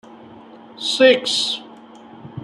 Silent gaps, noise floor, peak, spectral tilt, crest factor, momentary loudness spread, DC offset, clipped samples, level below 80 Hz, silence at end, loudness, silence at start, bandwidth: none; -42 dBFS; -2 dBFS; -2.5 dB/octave; 20 dB; 14 LU; under 0.1%; under 0.1%; -68 dBFS; 0 s; -17 LUFS; 0.3 s; 12 kHz